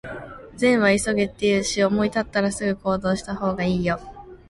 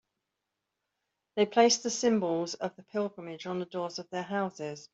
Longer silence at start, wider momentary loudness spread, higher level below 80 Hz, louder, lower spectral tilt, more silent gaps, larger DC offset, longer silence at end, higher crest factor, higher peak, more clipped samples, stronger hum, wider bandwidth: second, 0.05 s vs 1.35 s; about the same, 12 LU vs 13 LU; first, -46 dBFS vs -76 dBFS; first, -22 LUFS vs -30 LUFS; first, -5 dB/octave vs -3.5 dB/octave; neither; neither; about the same, 0.15 s vs 0.05 s; second, 16 dB vs 22 dB; first, -6 dBFS vs -10 dBFS; neither; neither; first, 11.5 kHz vs 8.2 kHz